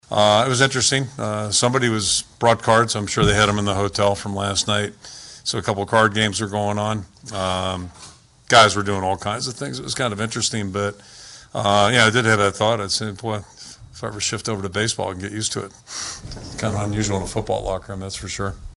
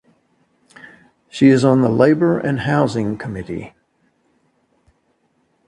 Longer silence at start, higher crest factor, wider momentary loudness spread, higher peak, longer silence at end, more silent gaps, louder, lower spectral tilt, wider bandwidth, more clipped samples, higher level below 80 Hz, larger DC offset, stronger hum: second, 0.1 s vs 0.85 s; about the same, 20 dB vs 18 dB; about the same, 15 LU vs 17 LU; about the same, 0 dBFS vs 0 dBFS; second, 0.05 s vs 2 s; neither; second, -20 LUFS vs -16 LUFS; second, -3.5 dB/octave vs -7.5 dB/octave; first, 11.5 kHz vs 10 kHz; neither; first, -44 dBFS vs -52 dBFS; neither; neither